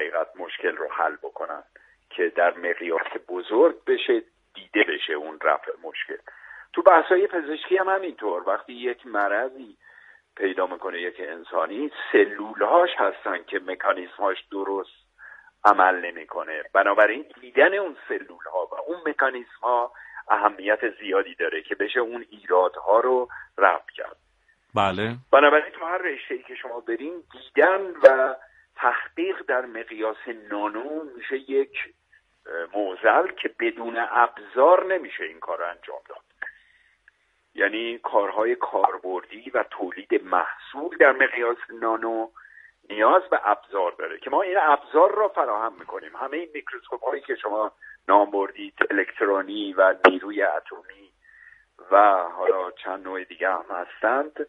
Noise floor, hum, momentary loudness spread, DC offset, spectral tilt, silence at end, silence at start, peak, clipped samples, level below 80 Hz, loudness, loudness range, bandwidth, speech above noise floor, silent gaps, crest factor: -64 dBFS; none; 15 LU; under 0.1%; -6 dB/octave; 0 s; 0 s; 0 dBFS; under 0.1%; -70 dBFS; -23 LUFS; 5 LU; 7.2 kHz; 41 dB; none; 24 dB